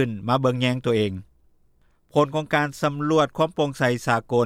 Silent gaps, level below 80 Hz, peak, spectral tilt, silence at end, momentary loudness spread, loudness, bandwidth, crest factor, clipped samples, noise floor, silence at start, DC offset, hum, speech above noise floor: none; -58 dBFS; -6 dBFS; -6 dB/octave; 0 s; 4 LU; -23 LUFS; 15.5 kHz; 16 dB; under 0.1%; -60 dBFS; 0 s; under 0.1%; none; 38 dB